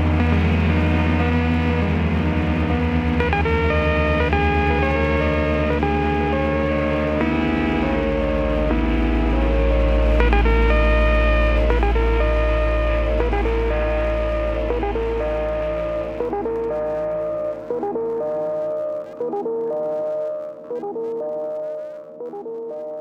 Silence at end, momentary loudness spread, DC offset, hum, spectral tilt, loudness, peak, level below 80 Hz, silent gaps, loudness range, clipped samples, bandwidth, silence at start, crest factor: 0 s; 9 LU; under 0.1%; none; -8.5 dB/octave; -21 LUFS; -2 dBFS; -24 dBFS; none; 7 LU; under 0.1%; 6.2 kHz; 0 s; 16 dB